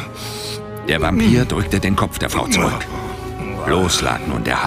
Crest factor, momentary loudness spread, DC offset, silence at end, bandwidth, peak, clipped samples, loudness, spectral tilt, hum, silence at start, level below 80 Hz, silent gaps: 18 dB; 12 LU; under 0.1%; 0 s; 16 kHz; 0 dBFS; under 0.1%; -19 LUFS; -4.5 dB/octave; none; 0 s; -32 dBFS; none